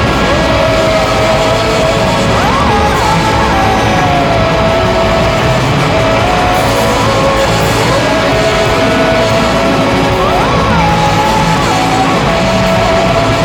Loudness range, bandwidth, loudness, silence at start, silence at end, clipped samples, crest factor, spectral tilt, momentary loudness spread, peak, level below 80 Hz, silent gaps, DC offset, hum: 0 LU; 20 kHz; -10 LUFS; 0 s; 0 s; under 0.1%; 10 dB; -5 dB/octave; 1 LU; 0 dBFS; -22 dBFS; none; under 0.1%; none